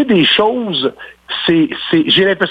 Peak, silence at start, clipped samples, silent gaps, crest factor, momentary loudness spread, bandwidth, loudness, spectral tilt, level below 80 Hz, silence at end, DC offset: -2 dBFS; 0 s; under 0.1%; none; 12 dB; 8 LU; 5.6 kHz; -13 LUFS; -7 dB/octave; -50 dBFS; 0 s; under 0.1%